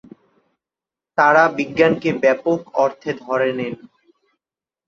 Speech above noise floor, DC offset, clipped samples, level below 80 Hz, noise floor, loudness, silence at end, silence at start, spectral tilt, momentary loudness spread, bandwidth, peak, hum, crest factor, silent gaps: 72 dB; under 0.1%; under 0.1%; -62 dBFS; -90 dBFS; -18 LUFS; 1.15 s; 1.15 s; -6 dB/octave; 13 LU; 7.4 kHz; -2 dBFS; none; 18 dB; none